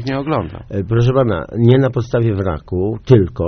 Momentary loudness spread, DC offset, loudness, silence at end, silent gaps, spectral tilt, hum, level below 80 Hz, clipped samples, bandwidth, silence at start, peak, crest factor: 8 LU; under 0.1%; -16 LUFS; 0 s; none; -8 dB/octave; none; -36 dBFS; under 0.1%; 6.4 kHz; 0 s; 0 dBFS; 16 dB